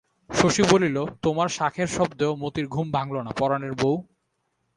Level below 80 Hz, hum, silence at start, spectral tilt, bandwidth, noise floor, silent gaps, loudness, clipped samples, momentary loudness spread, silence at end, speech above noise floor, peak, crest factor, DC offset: -52 dBFS; none; 0.3 s; -5 dB/octave; 11 kHz; -74 dBFS; none; -24 LUFS; under 0.1%; 9 LU; 0.75 s; 51 dB; 0 dBFS; 24 dB; under 0.1%